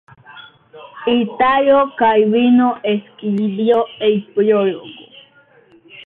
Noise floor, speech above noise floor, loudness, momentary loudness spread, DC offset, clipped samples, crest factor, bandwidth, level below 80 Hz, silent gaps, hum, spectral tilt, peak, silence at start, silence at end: -50 dBFS; 35 dB; -15 LUFS; 9 LU; under 0.1%; under 0.1%; 14 dB; 4 kHz; -58 dBFS; none; none; -9 dB/octave; -4 dBFS; 0.3 s; 0.05 s